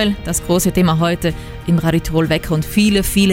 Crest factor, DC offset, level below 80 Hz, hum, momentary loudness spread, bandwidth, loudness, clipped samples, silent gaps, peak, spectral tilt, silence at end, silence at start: 14 dB; under 0.1%; -30 dBFS; none; 6 LU; 17 kHz; -16 LUFS; under 0.1%; none; 0 dBFS; -5 dB/octave; 0 s; 0 s